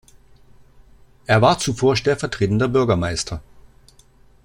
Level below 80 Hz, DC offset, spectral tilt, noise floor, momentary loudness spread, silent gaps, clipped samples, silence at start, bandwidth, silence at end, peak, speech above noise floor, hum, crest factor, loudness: -44 dBFS; under 0.1%; -5 dB/octave; -51 dBFS; 12 LU; none; under 0.1%; 1.3 s; 16 kHz; 1.05 s; -2 dBFS; 33 dB; none; 18 dB; -19 LUFS